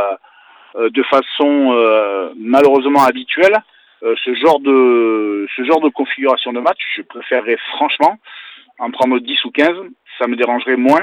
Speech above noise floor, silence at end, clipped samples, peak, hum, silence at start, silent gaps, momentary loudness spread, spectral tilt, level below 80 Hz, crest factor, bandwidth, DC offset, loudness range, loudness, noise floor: 32 dB; 0 s; under 0.1%; 0 dBFS; none; 0 s; none; 12 LU; -4.5 dB/octave; -66 dBFS; 14 dB; 19.5 kHz; under 0.1%; 4 LU; -14 LUFS; -45 dBFS